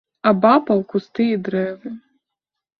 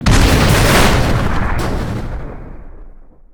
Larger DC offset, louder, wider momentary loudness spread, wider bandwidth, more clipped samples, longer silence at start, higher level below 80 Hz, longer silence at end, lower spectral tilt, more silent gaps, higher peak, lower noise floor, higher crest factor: neither; second, -18 LUFS vs -14 LUFS; about the same, 19 LU vs 18 LU; second, 5.8 kHz vs over 20 kHz; neither; first, 0.25 s vs 0 s; second, -64 dBFS vs -18 dBFS; first, 0.8 s vs 0.3 s; first, -9 dB/octave vs -5 dB/octave; neither; about the same, -2 dBFS vs 0 dBFS; first, -83 dBFS vs -36 dBFS; about the same, 18 dB vs 14 dB